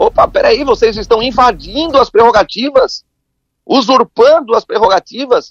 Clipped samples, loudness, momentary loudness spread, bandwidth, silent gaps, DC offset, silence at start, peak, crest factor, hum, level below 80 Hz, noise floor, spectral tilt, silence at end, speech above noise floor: 0.3%; -10 LUFS; 6 LU; 7.4 kHz; none; under 0.1%; 0 s; 0 dBFS; 10 dB; none; -36 dBFS; -69 dBFS; -4 dB/octave; 0.05 s; 59 dB